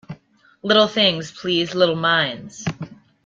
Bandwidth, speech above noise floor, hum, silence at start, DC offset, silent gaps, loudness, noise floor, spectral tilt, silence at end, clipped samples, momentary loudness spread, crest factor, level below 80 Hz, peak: 7.6 kHz; 35 dB; none; 0.1 s; under 0.1%; none; -19 LUFS; -54 dBFS; -4.5 dB/octave; 0.3 s; under 0.1%; 14 LU; 18 dB; -60 dBFS; -2 dBFS